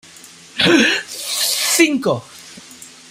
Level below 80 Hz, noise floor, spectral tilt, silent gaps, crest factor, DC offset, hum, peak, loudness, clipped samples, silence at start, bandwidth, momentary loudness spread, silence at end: -60 dBFS; -41 dBFS; -2 dB/octave; none; 18 dB; under 0.1%; none; 0 dBFS; -15 LUFS; under 0.1%; 0.55 s; 16 kHz; 24 LU; 0.25 s